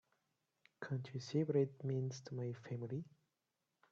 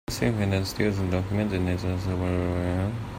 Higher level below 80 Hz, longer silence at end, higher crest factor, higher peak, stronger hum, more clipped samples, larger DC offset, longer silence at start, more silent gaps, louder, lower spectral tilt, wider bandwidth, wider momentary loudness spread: second, -82 dBFS vs -46 dBFS; first, 0.85 s vs 0 s; about the same, 20 dB vs 18 dB; second, -24 dBFS vs -8 dBFS; neither; neither; neither; first, 0.8 s vs 0.1 s; neither; second, -42 LUFS vs -27 LUFS; about the same, -7.5 dB/octave vs -6.5 dB/octave; second, 7.6 kHz vs 16 kHz; first, 10 LU vs 3 LU